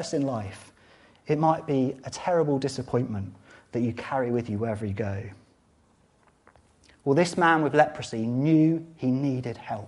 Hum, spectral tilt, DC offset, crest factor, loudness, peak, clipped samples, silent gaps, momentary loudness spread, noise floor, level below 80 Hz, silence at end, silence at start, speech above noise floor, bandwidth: none; -6.5 dB/octave; under 0.1%; 22 dB; -26 LUFS; -6 dBFS; under 0.1%; none; 13 LU; -63 dBFS; -62 dBFS; 0 s; 0 s; 37 dB; 11.5 kHz